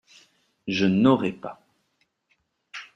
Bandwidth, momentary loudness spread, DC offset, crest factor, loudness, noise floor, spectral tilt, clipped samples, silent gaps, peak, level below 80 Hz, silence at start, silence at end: 7.8 kHz; 21 LU; under 0.1%; 22 dB; -22 LUFS; -72 dBFS; -7 dB/octave; under 0.1%; none; -4 dBFS; -64 dBFS; 0.65 s; 0.1 s